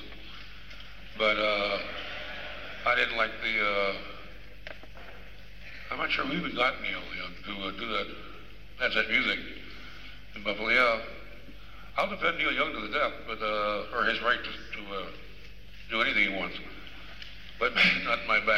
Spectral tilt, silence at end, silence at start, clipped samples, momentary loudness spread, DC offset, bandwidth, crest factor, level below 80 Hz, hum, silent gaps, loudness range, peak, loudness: -4 dB/octave; 0 s; 0 s; under 0.1%; 22 LU; 0.7%; 16 kHz; 22 dB; -52 dBFS; none; none; 4 LU; -10 dBFS; -28 LUFS